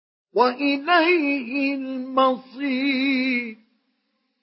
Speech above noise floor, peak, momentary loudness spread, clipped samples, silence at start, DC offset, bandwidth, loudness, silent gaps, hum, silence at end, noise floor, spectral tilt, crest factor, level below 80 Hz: 51 dB; -4 dBFS; 9 LU; under 0.1%; 0.35 s; under 0.1%; 5.8 kHz; -21 LUFS; none; none; 0.9 s; -73 dBFS; -8 dB/octave; 18 dB; -82 dBFS